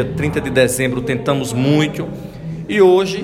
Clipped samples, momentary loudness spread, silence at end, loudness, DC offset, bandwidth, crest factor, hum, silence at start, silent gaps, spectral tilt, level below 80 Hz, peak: under 0.1%; 16 LU; 0 s; -16 LUFS; under 0.1%; 16 kHz; 16 dB; none; 0 s; none; -5.5 dB/octave; -42 dBFS; 0 dBFS